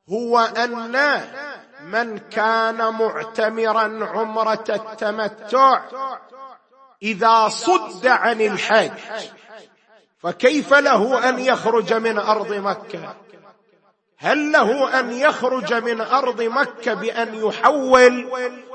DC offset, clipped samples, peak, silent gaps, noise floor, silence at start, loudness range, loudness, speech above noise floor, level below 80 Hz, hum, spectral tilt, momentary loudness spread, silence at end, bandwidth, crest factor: under 0.1%; under 0.1%; 0 dBFS; none; -60 dBFS; 0.1 s; 3 LU; -19 LUFS; 41 dB; -66 dBFS; none; -3.5 dB/octave; 14 LU; 0 s; 8.8 kHz; 20 dB